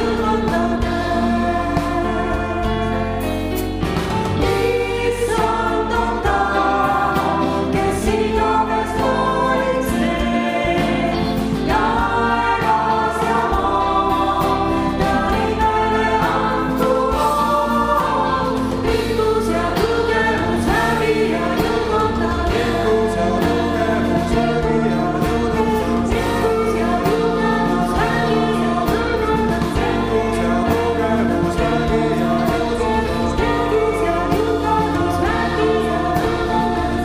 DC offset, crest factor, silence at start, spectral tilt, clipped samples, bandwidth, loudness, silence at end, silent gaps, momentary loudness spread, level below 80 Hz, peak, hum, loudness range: under 0.1%; 14 dB; 0 s; -6 dB/octave; under 0.1%; 16 kHz; -18 LUFS; 0 s; none; 3 LU; -30 dBFS; -4 dBFS; none; 2 LU